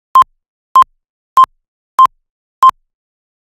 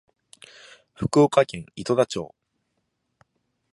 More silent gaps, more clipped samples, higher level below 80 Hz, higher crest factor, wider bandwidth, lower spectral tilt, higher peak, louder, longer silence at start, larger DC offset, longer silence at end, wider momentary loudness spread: first, 0.48-0.75 s, 1.09-1.36 s, 1.68-1.98 s, 2.30-2.62 s vs none; first, 0.5% vs under 0.1%; about the same, -56 dBFS vs -56 dBFS; second, 14 dB vs 22 dB; first, 17 kHz vs 11.5 kHz; second, -1.5 dB/octave vs -6 dB/octave; first, 0 dBFS vs -4 dBFS; first, -11 LUFS vs -23 LUFS; second, 0.15 s vs 1 s; neither; second, 0.75 s vs 1.45 s; second, 5 LU vs 15 LU